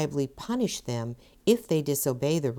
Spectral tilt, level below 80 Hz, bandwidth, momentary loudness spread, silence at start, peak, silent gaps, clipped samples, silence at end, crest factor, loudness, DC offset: -5.5 dB/octave; -58 dBFS; 19.5 kHz; 8 LU; 0 s; -10 dBFS; none; under 0.1%; 0 s; 18 dB; -28 LUFS; under 0.1%